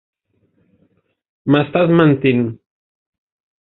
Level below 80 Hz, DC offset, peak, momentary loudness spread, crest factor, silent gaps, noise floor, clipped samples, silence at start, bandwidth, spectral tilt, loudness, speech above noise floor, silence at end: -56 dBFS; under 0.1%; 0 dBFS; 11 LU; 18 dB; none; -62 dBFS; under 0.1%; 1.45 s; 4.2 kHz; -10.5 dB/octave; -15 LUFS; 49 dB; 1.05 s